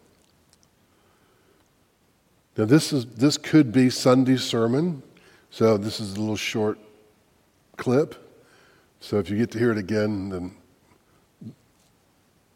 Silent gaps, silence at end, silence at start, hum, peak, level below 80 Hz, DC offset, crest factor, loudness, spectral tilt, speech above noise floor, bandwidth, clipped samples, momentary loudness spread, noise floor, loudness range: none; 1.05 s; 2.55 s; none; -4 dBFS; -64 dBFS; under 0.1%; 22 dB; -23 LUFS; -6 dB/octave; 42 dB; 16.5 kHz; under 0.1%; 20 LU; -64 dBFS; 7 LU